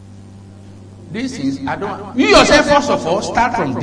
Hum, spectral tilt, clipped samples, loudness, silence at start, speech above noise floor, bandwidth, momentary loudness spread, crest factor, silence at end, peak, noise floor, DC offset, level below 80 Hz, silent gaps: none; -4 dB/octave; under 0.1%; -14 LUFS; 0 s; 23 dB; 11 kHz; 15 LU; 16 dB; 0 s; 0 dBFS; -37 dBFS; under 0.1%; -36 dBFS; none